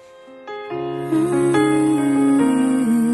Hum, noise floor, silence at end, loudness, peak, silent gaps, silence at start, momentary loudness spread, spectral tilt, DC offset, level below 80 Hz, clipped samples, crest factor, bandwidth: none; -40 dBFS; 0 s; -18 LUFS; -6 dBFS; none; 0.25 s; 12 LU; -6 dB/octave; under 0.1%; -56 dBFS; under 0.1%; 12 dB; 12 kHz